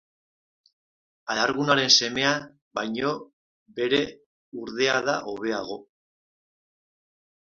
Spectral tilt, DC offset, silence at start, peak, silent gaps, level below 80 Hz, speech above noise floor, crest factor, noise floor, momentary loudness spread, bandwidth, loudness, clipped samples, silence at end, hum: -2.5 dB/octave; under 0.1%; 1.25 s; -4 dBFS; 2.62-2.71 s, 3.33-3.66 s, 4.26-4.52 s; -66 dBFS; over 65 dB; 24 dB; under -90 dBFS; 20 LU; 7.6 kHz; -24 LUFS; under 0.1%; 1.7 s; none